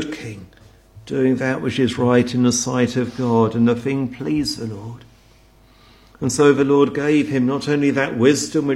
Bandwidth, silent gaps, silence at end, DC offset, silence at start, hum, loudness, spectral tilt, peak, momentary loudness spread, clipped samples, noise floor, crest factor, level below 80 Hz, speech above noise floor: 13 kHz; none; 0 s; under 0.1%; 0 s; none; -18 LUFS; -5.5 dB/octave; 0 dBFS; 12 LU; under 0.1%; -51 dBFS; 18 dB; -52 dBFS; 33 dB